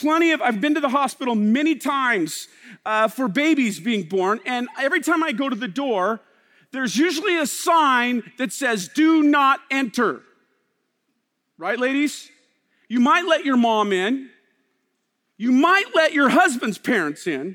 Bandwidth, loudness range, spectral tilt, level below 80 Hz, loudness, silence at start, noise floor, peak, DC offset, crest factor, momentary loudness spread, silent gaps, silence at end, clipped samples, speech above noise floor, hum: 17.5 kHz; 4 LU; -4 dB/octave; -76 dBFS; -20 LUFS; 0 s; -73 dBFS; -4 dBFS; under 0.1%; 18 dB; 11 LU; none; 0 s; under 0.1%; 53 dB; none